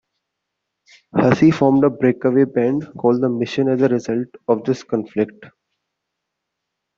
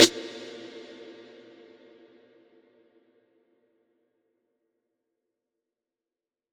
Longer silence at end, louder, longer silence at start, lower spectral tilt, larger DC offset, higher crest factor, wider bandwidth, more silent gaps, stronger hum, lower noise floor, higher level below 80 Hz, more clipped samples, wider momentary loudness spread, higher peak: second, 1.5 s vs 6.05 s; first, -18 LUFS vs -28 LUFS; first, 1.15 s vs 0 s; first, -8 dB/octave vs -1.5 dB/octave; neither; second, 18 dB vs 32 dB; second, 7.4 kHz vs 18 kHz; neither; neither; second, -79 dBFS vs under -90 dBFS; first, -58 dBFS vs -78 dBFS; neither; second, 10 LU vs 17 LU; about the same, 0 dBFS vs -2 dBFS